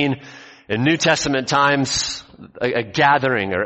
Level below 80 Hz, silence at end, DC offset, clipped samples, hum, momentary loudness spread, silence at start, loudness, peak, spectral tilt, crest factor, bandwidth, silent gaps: -50 dBFS; 0 s; under 0.1%; under 0.1%; none; 10 LU; 0 s; -18 LUFS; -2 dBFS; -4 dB/octave; 18 dB; 8.4 kHz; none